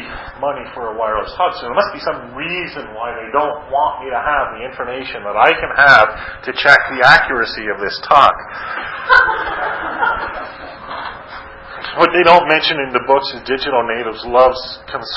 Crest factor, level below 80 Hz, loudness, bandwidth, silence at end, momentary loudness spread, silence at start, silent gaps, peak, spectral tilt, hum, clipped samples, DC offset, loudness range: 16 dB; -44 dBFS; -14 LUFS; 8 kHz; 0 s; 17 LU; 0 s; none; 0 dBFS; -4.5 dB/octave; none; 0.2%; under 0.1%; 8 LU